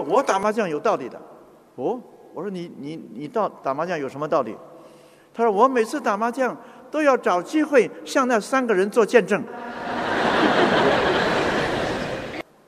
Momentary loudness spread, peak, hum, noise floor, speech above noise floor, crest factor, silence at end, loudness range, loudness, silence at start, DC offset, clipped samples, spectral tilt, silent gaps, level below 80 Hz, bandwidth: 15 LU; -4 dBFS; none; -49 dBFS; 27 dB; 20 dB; 0.25 s; 8 LU; -22 LUFS; 0 s; under 0.1%; under 0.1%; -4.5 dB/octave; none; -54 dBFS; 14.5 kHz